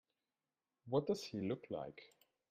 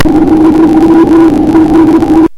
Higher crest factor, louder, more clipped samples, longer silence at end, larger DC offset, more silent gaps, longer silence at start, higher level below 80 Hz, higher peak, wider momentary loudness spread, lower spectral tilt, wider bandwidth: first, 22 dB vs 4 dB; second, -42 LUFS vs -5 LUFS; second, under 0.1% vs 4%; first, 0.45 s vs 0 s; neither; neither; first, 0.85 s vs 0 s; second, -80 dBFS vs -24 dBFS; second, -22 dBFS vs 0 dBFS; first, 12 LU vs 1 LU; second, -6.5 dB/octave vs -8 dB/octave; first, 15.5 kHz vs 10.5 kHz